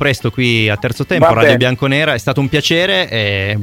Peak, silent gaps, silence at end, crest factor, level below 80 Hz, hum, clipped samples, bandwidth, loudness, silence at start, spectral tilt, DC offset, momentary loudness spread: 0 dBFS; none; 0 s; 14 dB; -42 dBFS; none; under 0.1%; 16.5 kHz; -13 LUFS; 0 s; -5.5 dB/octave; under 0.1%; 6 LU